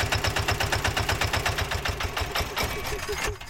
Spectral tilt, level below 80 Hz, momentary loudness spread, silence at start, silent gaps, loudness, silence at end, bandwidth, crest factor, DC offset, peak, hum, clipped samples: -3 dB/octave; -36 dBFS; 5 LU; 0 s; none; -27 LUFS; 0 s; 17 kHz; 18 dB; under 0.1%; -10 dBFS; none; under 0.1%